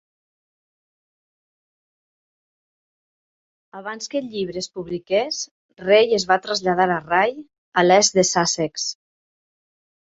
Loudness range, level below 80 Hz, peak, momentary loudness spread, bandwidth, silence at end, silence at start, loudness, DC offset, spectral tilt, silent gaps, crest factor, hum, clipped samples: 14 LU; -62 dBFS; -2 dBFS; 15 LU; 8 kHz; 1.25 s; 3.75 s; -20 LUFS; under 0.1%; -3 dB/octave; 5.51-5.69 s, 7.58-7.72 s; 22 dB; none; under 0.1%